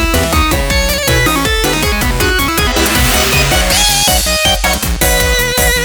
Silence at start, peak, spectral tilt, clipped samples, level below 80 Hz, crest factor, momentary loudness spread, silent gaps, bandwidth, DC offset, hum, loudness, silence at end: 0 s; 0 dBFS; -2.5 dB/octave; under 0.1%; -18 dBFS; 12 dB; 4 LU; none; over 20 kHz; under 0.1%; none; -11 LUFS; 0 s